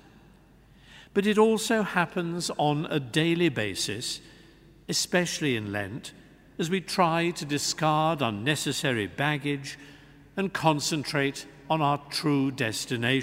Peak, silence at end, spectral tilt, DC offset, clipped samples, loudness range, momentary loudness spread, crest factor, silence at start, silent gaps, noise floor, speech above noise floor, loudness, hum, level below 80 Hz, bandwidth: -6 dBFS; 0 s; -4.5 dB/octave; under 0.1%; under 0.1%; 3 LU; 9 LU; 22 dB; 0.9 s; none; -56 dBFS; 29 dB; -27 LUFS; none; -62 dBFS; 16 kHz